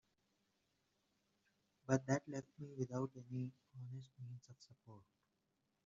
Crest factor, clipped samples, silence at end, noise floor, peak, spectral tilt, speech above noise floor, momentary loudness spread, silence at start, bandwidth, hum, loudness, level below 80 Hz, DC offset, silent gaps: 26 dB; under 0.1%; 0.85 s; -86 dBFS; -22 dBFS; -7.5 dB/octave; 41 dB; 23 LU; 1.9 s; 7.4 kHz; none; -45 LUFS; -82 dBFS; under 0.1%; none